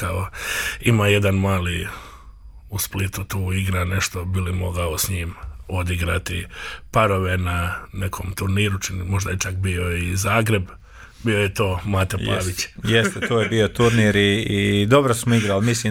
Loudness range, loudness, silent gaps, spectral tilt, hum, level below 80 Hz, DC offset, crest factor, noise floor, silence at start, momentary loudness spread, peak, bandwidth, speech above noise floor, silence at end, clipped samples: 6 LU; -21 LUFS; none; -5 dB/octave; none; -38 dBFS; under 0.1%; 18 dB; -42 dBFS; 0 s; 11 LU; -4 dBFS; 17.5 kHz; 21 dB; 0 s; under 0.1%